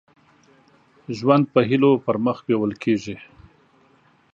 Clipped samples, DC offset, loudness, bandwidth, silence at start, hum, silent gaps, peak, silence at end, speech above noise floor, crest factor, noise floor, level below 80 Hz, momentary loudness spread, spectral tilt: under 0.1%; under 0.1%; -20 LUFS; 7.6 kHz; 1.1 s; none; none; -2 dBFS; 1.1 s; 38 dB; 20 dB; -58 dBFS; -62 dBFS; 14 LU; -7.5 dB/octave